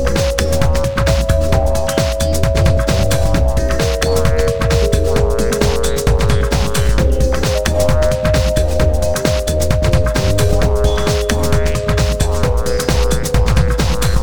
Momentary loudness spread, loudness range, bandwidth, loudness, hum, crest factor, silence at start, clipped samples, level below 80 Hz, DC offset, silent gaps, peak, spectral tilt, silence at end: 2 LU; 1 LU; 19.5 kHz; -15 LUFS; none; 14 dB; 0 s; under 0.1%; -18 dBFS; 7%; none; 0 dBFS; -5 dB/octave; 0 s